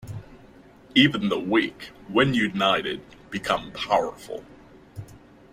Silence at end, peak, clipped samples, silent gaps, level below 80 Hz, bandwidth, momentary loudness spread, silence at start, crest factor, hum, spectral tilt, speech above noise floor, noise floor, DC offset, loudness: 0.35 s; -4 dBFS; under 0.1%; none; -56 dBFS; 15.5 kHz; 22 LU; 0.05 s; 22 dB; none; -5.5 dB/octave; 26 dB; -50 dBFS; under 0.1%; -23 LUFS